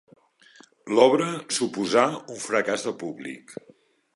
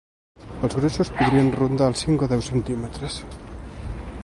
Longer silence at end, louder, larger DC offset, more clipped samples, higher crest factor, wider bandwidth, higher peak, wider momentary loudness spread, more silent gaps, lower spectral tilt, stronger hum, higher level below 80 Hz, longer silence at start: first, 0.6 s vs 0 s; about the same, -24 LUFS vs -22 LUFS; neither; neither; about the same, 22 dB vs 18 dB; about the same, 11.5 kHz vs 11.5 kHz; first, -2 dBFS vs -6 dBFS; about the same, 19 LU vs 18 LU; neither; second, -3.5 dB/octave vs -6.5 dB/octave; neither; second, -74 dBFS vs -38 dBFS; first, 0.85 s vs 0.4 s